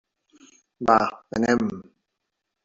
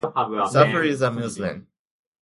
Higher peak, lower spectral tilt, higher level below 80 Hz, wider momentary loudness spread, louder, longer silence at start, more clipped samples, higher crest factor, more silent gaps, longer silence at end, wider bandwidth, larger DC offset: about the same, -4 dBFS vs -2 dBFS; about the same, -5.5 dB/octave vs -5.5 dB/octave; about the same, -58 dBFS vs -58 dBFS; second, 10 LU vs 13 LU; about the same, -23 LUFS vs -22 LUFS; first, 0.8 s vs 0.05 s; neither; about the same, 22 dB vs 20 dB; neither; first, 0.85 s vs 0.6 s; second, 7.8 kHz vs 11.5 kHz; neither